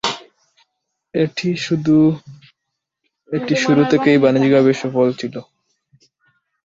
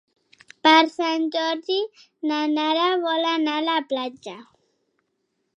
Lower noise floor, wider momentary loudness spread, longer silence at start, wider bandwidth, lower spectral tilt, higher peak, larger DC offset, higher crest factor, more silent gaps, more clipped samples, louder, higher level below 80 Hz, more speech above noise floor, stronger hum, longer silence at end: first, -79 dBFS vs -74 dBFS; about the same, 14 LU vs 15 LU; second, 0.05 s vs 0.65 s; about the same, 7.8 kHz vs 8.2 kHz; first, -6 dB/octave vs -2.5 dB/octave; about the same, 0 dBFS vs -2 dBFS; neither; about the same, 18 dB vs 22 dB; neither; neither; first, -16 LUFS vs -22 LUFS; first, -58 dBFS vs -78 dBFS; first, 63 dB vs 52 dB; neither; about the same, 1.2 s vs 1.15 s